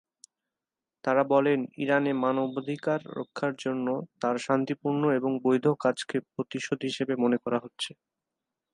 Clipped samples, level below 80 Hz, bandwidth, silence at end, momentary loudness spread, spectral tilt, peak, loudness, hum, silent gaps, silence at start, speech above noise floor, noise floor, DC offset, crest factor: under 0.1%; -76 dBFS; 11.5 kHz; 0.85 s; 9 LU; -6 dB/octave; -10 dBFS; -28 LUFS; none; none; 1.05 s; over 62 dB; under -90 dBFS; under 0.1%; 18 dB